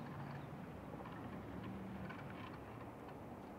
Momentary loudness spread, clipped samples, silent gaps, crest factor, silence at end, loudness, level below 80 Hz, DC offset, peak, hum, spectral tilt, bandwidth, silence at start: 3 LU; under 0.1%; none; 12 dB; 0 s; -51 LUFS; -66 dBFS; under 0.1%; -38 dBFS; none; -7.5 dB/octave; 16 kHz; 0 s